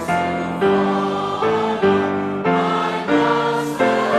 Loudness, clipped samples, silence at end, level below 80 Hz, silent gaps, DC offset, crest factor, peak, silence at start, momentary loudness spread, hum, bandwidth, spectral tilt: -19 LUFS; under 0.1%; 0 s; -54 dBFS; none; under 0.1%; 14 dB; -4 dBFS; 0 s; 4 LU; none; 13.5 kHz; -6 dB/octave